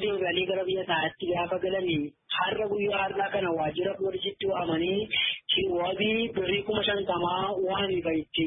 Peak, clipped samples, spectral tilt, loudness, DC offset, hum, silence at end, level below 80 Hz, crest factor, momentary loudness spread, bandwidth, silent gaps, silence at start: -12 dBFS; under 0.1%; -9 dB/octave; -28 LUFS; under 0.1%; none; 0 s; -58 dBFS; 16 dB; 4 LU; 3.9 kHz; none; 0 s